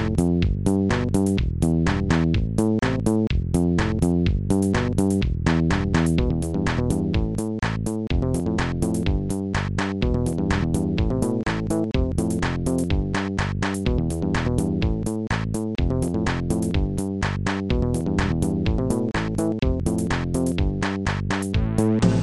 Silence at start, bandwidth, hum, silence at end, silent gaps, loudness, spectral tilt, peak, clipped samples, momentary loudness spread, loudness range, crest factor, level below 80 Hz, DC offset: 0 s; 12.5 kHz; none; 0 s; none; -23 LUFS; -6.5 dB/octave; -8 dBFS; under 0.1%; 4 LU; 3 LU; 14 dB; -30 dBFS; 0.2%